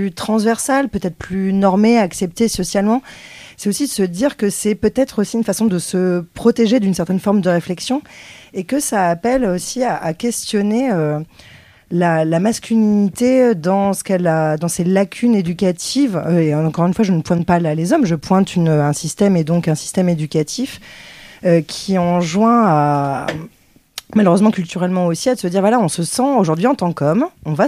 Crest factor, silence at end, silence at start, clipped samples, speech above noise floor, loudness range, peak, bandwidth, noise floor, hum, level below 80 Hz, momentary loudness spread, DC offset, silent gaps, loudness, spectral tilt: 16 dB; 0 s; 0 s; under 0.1%; 21 dB; 3 LU; 0 dBFS; 15.5 kHz; -37 dBFS; none; -48 dBFS; 8 LU; under 0.1%; none; -16 LUFS; -6 dB/octave